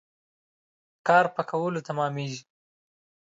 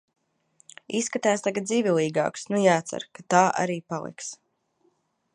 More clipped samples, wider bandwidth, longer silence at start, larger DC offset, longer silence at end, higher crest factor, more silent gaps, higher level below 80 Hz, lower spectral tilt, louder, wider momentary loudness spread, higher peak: neither; second, 8 kHz vs 11.5 kHz; first, 1.05 s vs 0.9 s; neither; second, 0.85 s vs 1 s; about the same, 22 dB vs 22 dB; neither; about the same, -78 dBFS vs -74 dBFS; about the same, -5.5 dB/octave vs -4.5 dB/octave; about the same, -26 LUFS vs -25 LUFS; about the same, 13 LU vs 14 LU; about the same, -6 dBFS vs -4 dBFS